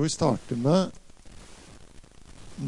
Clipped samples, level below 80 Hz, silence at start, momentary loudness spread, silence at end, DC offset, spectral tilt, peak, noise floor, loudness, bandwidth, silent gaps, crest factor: under 0.1%; -52 dBFS; 0 s; 25 LU; 0 s; under 0.1%; -6 dB/octave; -10 dBFS; -48 dBFS; -26 LUFS; 11.5 kHz; none; 18 dB